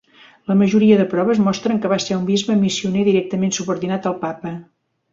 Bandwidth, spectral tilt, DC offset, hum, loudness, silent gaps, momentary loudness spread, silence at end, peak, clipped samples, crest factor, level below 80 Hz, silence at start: 7.8 kHz; -5.5 dB/octave; under 0.1%; none; -18 LUFS; none; 12 LU; 0.5 s; -2 dBFS; under 0.1%; 16 dB; -58 dBFS; 0.5 s